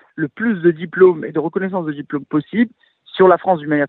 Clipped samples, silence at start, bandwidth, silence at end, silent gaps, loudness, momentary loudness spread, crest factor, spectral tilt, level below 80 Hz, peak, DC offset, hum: under 0.1%; 0.15 s; 4.1 kHz; 0 s; none; -17 LUFS; 11 LU; 16 dB; -10 dB/octave; -66 dBFS; 0 dBFS; under 0.1%; none